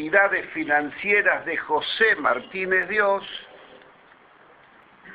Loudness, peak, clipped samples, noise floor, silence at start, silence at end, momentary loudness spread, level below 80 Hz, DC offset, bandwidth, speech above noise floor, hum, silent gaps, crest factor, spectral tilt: -22 LUFS; -4 dBFS; under 0.1%; -53 dBFS; 0 s; 0 s; 7 LU; -64 dBFS; under 0.1%; 10 kHz; 30 dB; none; none; 20 dB; -6 dB/octave